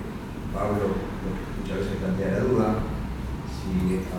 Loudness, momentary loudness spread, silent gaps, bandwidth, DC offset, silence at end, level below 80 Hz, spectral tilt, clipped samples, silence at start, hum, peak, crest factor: -28 LUFS; 10 LU; none; 16.5 kHz; under 0.1%; 0 s; -36 dBFS; -7.5 dB/octave; under 0.1%; 0 s; none; -12 dBFS; 16 dB